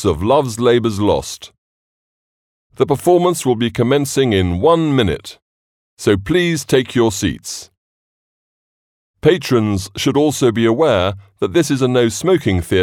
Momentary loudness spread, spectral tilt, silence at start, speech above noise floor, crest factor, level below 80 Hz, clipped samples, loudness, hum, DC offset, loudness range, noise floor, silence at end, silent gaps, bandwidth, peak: 7 LU; -5.5 dB/octave; 0 s; over 75 dB; 16 dB; -44 dBFS; under 0.1%; -16 LUFS; none; under 0.1%; 4 LU; under -90 dBFS; 0 s; 1.58-2.70 s, 5.42-5.97 s, 7.77-9.14 s; 17.5 kHz; 0 dBFS